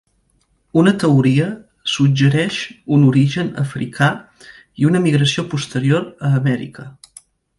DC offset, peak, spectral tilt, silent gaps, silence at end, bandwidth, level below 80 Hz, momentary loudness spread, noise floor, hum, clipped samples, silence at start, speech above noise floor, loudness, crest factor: under 0.1%; 0 dBFS; -6.5 dB/octave; none; 0.7 s; 11.5 kHz; -54 dBFS; 11 LU; -62 dBFS; none; under 0.1%; 0.75 s; 46 dB; -17 LUFS; 16 dB